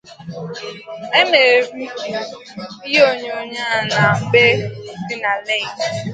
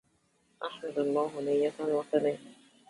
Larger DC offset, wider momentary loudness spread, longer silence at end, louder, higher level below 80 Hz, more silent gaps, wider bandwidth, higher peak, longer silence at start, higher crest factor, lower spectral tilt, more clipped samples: neither; first, 18 LU vs 12 LU; second, 0 s vs 0.35 s; first, -16 LUFS vs -31 LUFS; first, -58 dBFS vs -78 dBFS; neither; second, 9.2 kHz vs 11.5 kHz; first, 0 dBFS vs -14 dBFS; second, 0.05 s vs 0.6 s; about the same, 18 dB vs 18 dB; second, -4 dB/octave vs -6 dB/octave; neither